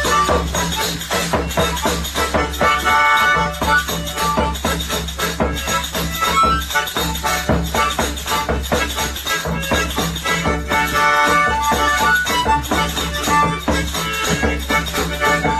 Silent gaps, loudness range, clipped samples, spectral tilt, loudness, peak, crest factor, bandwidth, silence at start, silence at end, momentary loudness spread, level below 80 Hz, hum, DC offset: none; 3 LU; under 0.1%; -3 dB/octave; -17 LUFS; -2 dBFS; 16 dB; 14 kHz; 0 s; 0 s; 6 LU; -28 dBFS; none; under 0.1%